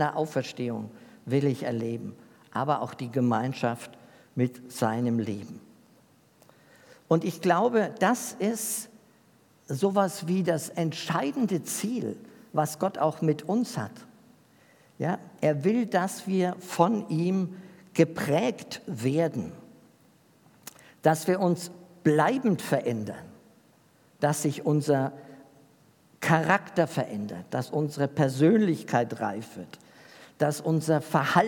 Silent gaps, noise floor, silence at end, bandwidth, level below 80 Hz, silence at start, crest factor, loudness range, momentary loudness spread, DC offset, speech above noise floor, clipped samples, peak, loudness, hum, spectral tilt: none; -61 dBFS; 0 s; 18 kHz; -76 dBFS; 0 s; 24 dB; 4 LU; 14 LU; under 0.1%; 34 dB; under 0.1%; -4 dBFS; -28 LUFS; none; -6 dB/octave